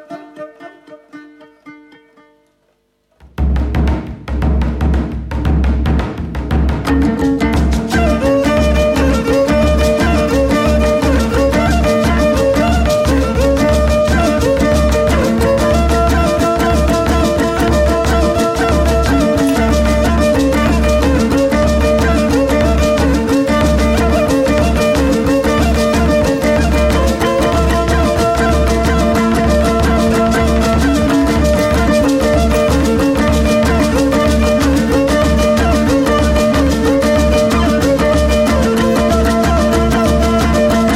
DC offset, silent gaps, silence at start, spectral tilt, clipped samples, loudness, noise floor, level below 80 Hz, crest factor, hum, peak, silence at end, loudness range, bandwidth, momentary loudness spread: under 0.1%; none; 0.1 s; -6 dB/octave; under 0.1%; -13 LUFS; -60 dBFS; -18 dBFS; 10 dB; none; -2 dBFS; 0 s; 4 LU; 16 kHz; 3 LU